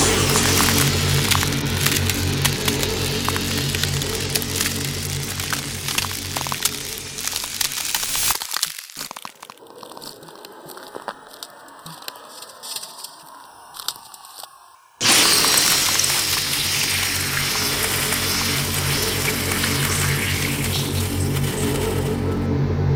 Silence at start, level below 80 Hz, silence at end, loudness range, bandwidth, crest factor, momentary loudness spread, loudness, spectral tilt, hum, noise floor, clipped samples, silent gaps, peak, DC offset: 0 s; -40 dBFS; 0 s; 18 LU; over 20 kHz; 22 dB; 22 LU; -19 LUFS; -2.5 dB/octave; none; -48 dBFS; under 0.1%; none; 0 dBFS; under 0.1%